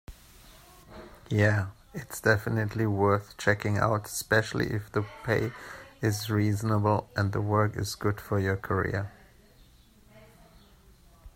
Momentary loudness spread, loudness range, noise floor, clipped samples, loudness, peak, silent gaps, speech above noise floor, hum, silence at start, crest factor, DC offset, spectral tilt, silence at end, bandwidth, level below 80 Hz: 11 LU; 4 LU; -57 dBFS; under 0.1%; -28 LUFS; -6 dBFS; none; 30 dB; none; 0.1 s; 22 dB; under 0.1%; -6 dB/octave; 0.05 s; 16 kHz; -54 dBFS